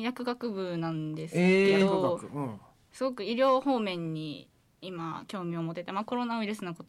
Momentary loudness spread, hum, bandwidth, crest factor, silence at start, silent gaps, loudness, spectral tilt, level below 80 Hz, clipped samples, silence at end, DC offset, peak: 15 LU; none; 12.5 kHz; 16 dB; 0 s; none; -30 LUFS; -6.5 dB/octave; -72 dBFS; under 0.1%; 0.05 s; under 0.1%; -16 dBFS